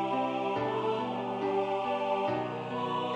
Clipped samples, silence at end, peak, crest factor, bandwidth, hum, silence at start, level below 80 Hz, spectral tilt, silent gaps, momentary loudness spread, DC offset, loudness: under 0.1%; 0 s; -18 dBFS; 12 dB; 9.4 kHz; none; 0 s; -72 dBFS; -6.5 dB/octave; none; 3 LU; under 0.1%; -32 LUFS